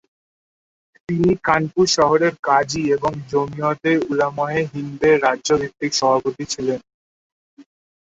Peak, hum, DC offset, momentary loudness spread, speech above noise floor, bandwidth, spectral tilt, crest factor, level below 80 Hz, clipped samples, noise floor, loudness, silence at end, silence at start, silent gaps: -2 dBFS; none; under 0.1%; 8 LU; over 71 dB; 8 kHz; -4.5 dB/octave; 18 dB; -52 dBFS; under 0.1%; under -90 dBFS; -19 LUFS; 0.4 s; 1.1 s; 2.39-2.43 s, 6.94-7.57 s